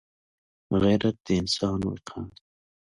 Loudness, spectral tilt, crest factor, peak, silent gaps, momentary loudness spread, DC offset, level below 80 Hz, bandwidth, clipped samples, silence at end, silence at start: -26 LUFS; -6 dB/octave; 18 dB; -10 dBFS; 1.20-1.24 s; 16 LU; under 0.1%; -48 dBFS; 11.5 kHz; under 0.1%; 0.65 s; 0.7 s